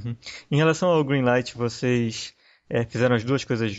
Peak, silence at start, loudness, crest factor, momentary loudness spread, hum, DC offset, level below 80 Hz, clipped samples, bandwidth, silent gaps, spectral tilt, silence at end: -10 dBFS; 0 s; -23 LUFS; 14 dB; 12 LU; none; under 0.1%; -58 dBFS; under 0.1%; 8 kHz; none; -6 dB/octave; 0 s